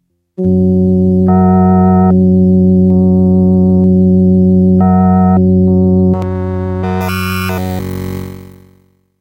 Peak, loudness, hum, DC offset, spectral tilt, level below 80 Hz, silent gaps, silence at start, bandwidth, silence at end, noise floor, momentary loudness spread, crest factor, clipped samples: 0 dBFS; -10 LUFS; none; under 0.1%; -9.5 dB/octave; -36 dBFS; none; 0.4 s; 16 kHz; 0.75 s; -50 dBFS; 9 LU; 10 dB; under 0.1%